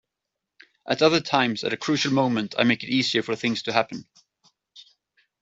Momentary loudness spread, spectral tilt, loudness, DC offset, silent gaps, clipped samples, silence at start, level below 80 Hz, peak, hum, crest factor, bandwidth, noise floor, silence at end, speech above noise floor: 8 LU; -4.5 dB/octave; -23 LUFS; under 0.1%; none; under 0.1%; 0.85 s; -66 dBFS; -2 dBFS; none; 24 dB; 8 kHz; -84 dBFS; 0.6 s; 61 dB